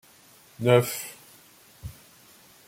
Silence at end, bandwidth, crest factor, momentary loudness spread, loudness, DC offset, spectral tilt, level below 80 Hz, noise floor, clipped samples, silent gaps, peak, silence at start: 0.75 s; 16.5 kHz; 24 dB; 23 LU; -24 LUFS; under 0.1%; -5.5 dB/octave; -58 dBFS; -55 dBFS; under 0.1%; none; -6 dBFS; 0.6 s